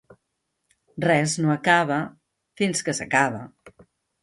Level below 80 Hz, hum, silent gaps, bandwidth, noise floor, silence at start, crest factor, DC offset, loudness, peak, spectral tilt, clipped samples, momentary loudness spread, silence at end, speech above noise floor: -64 dBFS; none; none; 11.5 kHz; -77 dBFS; 0.95 s; 20 dB; under 0.1%; -22 LUFS; -4 dBFS; -4.5 dB/octave; under 0.1%; 17 LU; 0.55 s; 55 dB